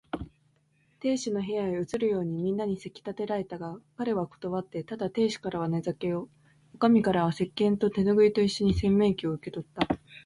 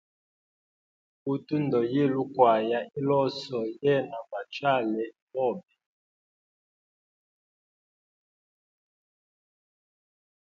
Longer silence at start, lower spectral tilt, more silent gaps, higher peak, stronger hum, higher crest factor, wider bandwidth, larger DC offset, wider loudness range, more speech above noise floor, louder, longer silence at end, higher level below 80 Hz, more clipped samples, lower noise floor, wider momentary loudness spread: second, 0.15 s vs 1.25 s; about the same, -6.5 dB/octave vs -7.5 dB/octave; second, none vs 5.22-5.27 s; about the same, -10 dBFS vs -8 dBFS; neither; second, 18 dB vs 24 dB; first, 11.5 kHz vs 7.6 kHz; neither; second, 7 LU vs 11 LU; second, 40 dB vs over 63 dB; about the same, -28 LUFS vs -27 LUFS; second, 0.05 s vs 4.85 s; first, -50 dBFS vs -76 dBFS; neither; second, -68 dBFS vs under -90 dBFS; about the same, 14 LU vs 13 LU